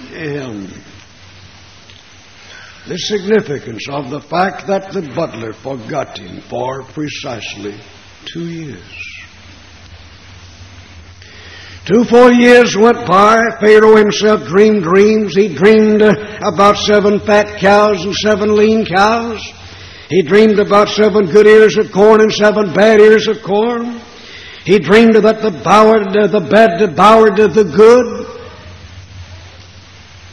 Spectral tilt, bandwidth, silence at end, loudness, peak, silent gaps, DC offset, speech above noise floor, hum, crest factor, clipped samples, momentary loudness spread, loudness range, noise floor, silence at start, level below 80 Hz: -5.5 dB/octave; 9.6 kHz; 0.85 s; -10 LUFS; 0 dBFS; none; 0.4%; 30 dB; none; 12 dB; 0.4%; 19 LU; 16 LU; -40 dBFS; 0 s; -46 dBFS